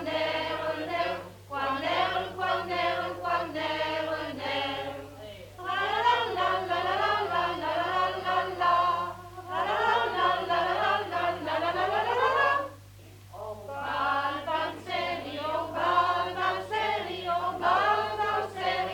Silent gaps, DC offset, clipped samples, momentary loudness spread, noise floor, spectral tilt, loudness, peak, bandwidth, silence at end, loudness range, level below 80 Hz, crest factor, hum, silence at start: none; under 0.1%; under 0.1%; 10 LU; -49 dBFS; -4.5 dB/octave; -28 LUFS; -12 dBFS; 19 kHz; 0 s; 3 LU; -60 dBFS; 16 dB; 50 Hz at -60 dBFS; 0 s